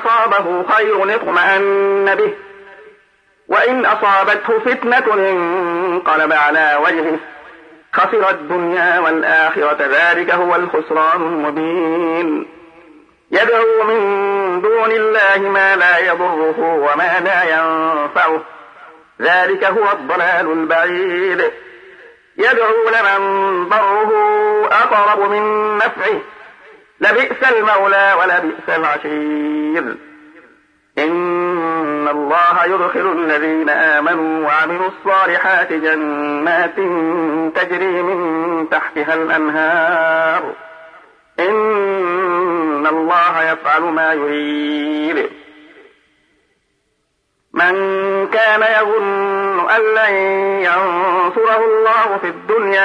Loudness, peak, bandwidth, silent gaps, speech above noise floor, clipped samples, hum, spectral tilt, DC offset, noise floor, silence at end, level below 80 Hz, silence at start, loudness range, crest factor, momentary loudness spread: -14 LUFS; -2 dBFS; 9.8 kHz; none; 51 dB; under 0.1%; none; -5.5 dB/octave; under 0.1%; -66 dBFS; 0 s; -68 dBFS; 0 s; 4 LU; 12 dB; 7 LU